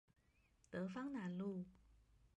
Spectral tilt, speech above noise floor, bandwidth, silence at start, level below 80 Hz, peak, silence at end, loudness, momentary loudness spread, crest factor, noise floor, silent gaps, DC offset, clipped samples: -8 dB/octave; 30 dB; 9 kHz; 0.7 s; -76 dBFS; -34 dBFS; 0.1 s; -48 LUFS; 6 LU; 16 dB; -76 dBFS; none; under 0.1%; under 0.1%